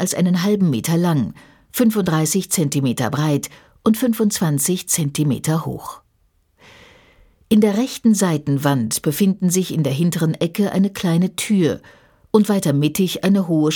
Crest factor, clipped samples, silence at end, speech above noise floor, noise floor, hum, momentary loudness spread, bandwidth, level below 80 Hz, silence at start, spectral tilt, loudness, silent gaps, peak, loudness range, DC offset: 18 dB; under 0.1%; 0 s; 44 dB; -61 dBFS; none; 5 LU; 19 kHz; -54 dBFS; 0 s; -5.5 dB/octave; -18 LUFS; none; -2 dBFS; 3 LU; under 0.1%